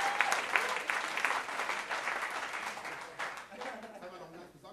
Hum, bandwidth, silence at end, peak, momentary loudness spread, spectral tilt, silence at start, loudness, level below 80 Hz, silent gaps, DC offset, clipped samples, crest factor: none; 14 kHz; 0 s; -10 dBFS; 17 LU; -0.5 dB/octave; 0 s; -34 LUFS; -76 dBFS; none; under 0.1%; under 0.1%; 28 dB